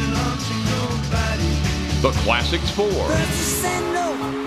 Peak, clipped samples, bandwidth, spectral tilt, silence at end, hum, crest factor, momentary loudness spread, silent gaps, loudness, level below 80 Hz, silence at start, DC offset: -4 dBFS; under 0.1%; 15 kHz; -4.5 dB/octave; 0 s; none; 18 dB; 4 LU; none; -21 LUFS; -28 dBFS; 0 s; 0.1%